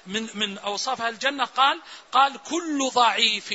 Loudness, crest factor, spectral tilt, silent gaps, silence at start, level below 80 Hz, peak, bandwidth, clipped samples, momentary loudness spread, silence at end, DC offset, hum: -23 LUFS; 20 dB; -1.5 dB/octave; none; 0.05 s; -72 dBFS; -4 dBFS; 8 kHz; under 0.1%; 8 LU; 0 s; under 0.1%; none